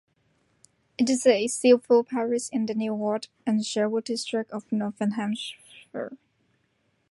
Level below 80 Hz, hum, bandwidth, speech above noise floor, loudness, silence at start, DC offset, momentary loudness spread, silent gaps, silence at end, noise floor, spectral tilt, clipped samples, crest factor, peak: -74 dBFS; none; 11.5 kHz; 46 dB; -25 LUFS; 1 s; under 0.1%; 16 LU; none; 0.95 s; -71 dBFS; -4.5 dB/octave; under 0.1%; 20 dB; -6 dBFS